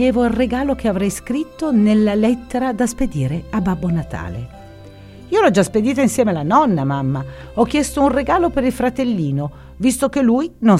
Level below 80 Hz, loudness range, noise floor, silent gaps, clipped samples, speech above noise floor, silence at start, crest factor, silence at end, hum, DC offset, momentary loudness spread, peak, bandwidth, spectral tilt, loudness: -38 dBFS; 3 LU; -38 dBFS; none; under 0.1%; 22 dB; 0 s; 18 dB; 0 s; none; under 0.1%; 9 LU; 0 dBFS; 15 kHz; -6 dB/octave; -18 LUFS